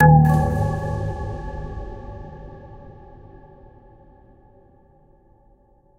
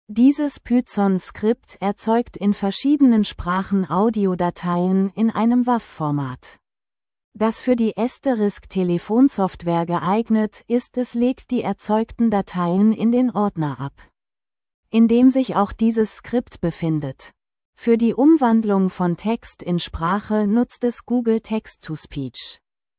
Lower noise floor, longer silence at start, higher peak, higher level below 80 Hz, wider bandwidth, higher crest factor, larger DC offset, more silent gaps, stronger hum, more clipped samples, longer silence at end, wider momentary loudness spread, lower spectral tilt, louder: second, -56 dBFS vs under -90 dBFS; about the same, 0 s vs 0.1 s; first, -2 dBFS vs -6 dBFS; first, -34 dBFS vs -48 dBFS; first, 7 kHz vs 4 kHz; first, 22 dB vs 14 dB; neither; second, none vs 7.24-7.32 s, 14.74-14.83 s, 17.65-17.73 s; neither; neither; first, 3.05 s vs 0.45 s; first, 28 LU vs 10 LU; second, -9.5 dB/octave vs -12 dB/octave; about the same, -21 LUFS vs -20 LUFS